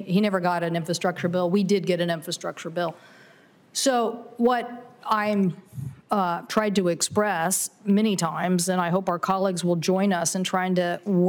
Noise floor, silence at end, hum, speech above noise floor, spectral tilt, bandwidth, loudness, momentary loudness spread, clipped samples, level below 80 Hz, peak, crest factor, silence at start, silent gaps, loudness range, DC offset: -54 dBFS; 0 s; none; 31 dB; -4.5 dB/octave; 19 kHz; -24 LUFS; 7 LU; under 0.1%; -68 dBFS; -10 dBFS; 14 dB; 0 s; none; 3 LU; under 0.1%